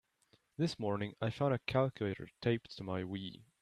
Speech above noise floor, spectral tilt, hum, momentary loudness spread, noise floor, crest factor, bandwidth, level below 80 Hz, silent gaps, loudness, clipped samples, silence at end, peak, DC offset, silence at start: 36 dB; -7 dB/octave; none; 9 LU; -73 dBFS; 20 dB; 12 kHz; -68 dBFS; none; -37 LUFS; under 0.1%; 0.2 s; -18 dBFS; under 0.1%; 0.6 s